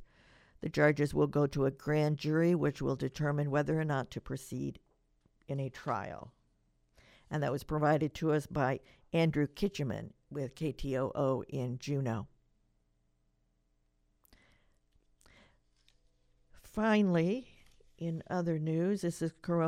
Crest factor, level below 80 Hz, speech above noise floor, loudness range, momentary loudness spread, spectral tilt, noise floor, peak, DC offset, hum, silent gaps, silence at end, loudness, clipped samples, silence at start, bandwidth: 22 dB; -58 dBFS; 43 dB; 9 LU; 12 LU; -7.5 dB/octave; -75 dBFS; -12 dBFS; under 0.1%; none; none; 0 s; -34 LUFS; under 0.1%; 0 s; 15 kHz